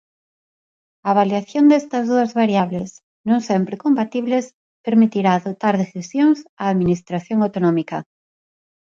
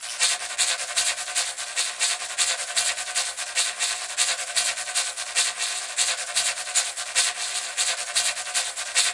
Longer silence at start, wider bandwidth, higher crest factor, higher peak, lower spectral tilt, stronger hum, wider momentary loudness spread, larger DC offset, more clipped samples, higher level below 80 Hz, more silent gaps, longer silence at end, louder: first, 1.05 s vs 0 s; second, 7.6 kHz vs 11.5 kHz; second, 16 dB vs 22 dB; about the same, -2 dBFS vs -4 dBFS; first, -7 dB/octave vs 4 dB/octave; neither; first, 11 LU vs 3 LU; neither; neither; first, -58 dBFS vs -72 dBFS; first, 3.03-3.24 s, 4.54-4.84 s, 6.49-6.57 s vs none; first, 0.9 s vs 0 s; first, -19 LUFS vs -23 LUFS